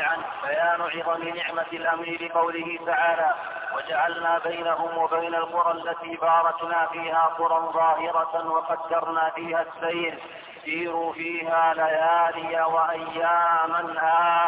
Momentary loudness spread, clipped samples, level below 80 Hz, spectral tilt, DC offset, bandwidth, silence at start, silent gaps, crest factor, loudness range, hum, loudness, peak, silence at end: 7 LU; under 0.1%; -72 dBFS; -7 dB/octave; under 0.1%; 4 kHz; 0 s; none; 14 dB; 3 LU; none; -24 LUFS; -10 dBFS; 0 s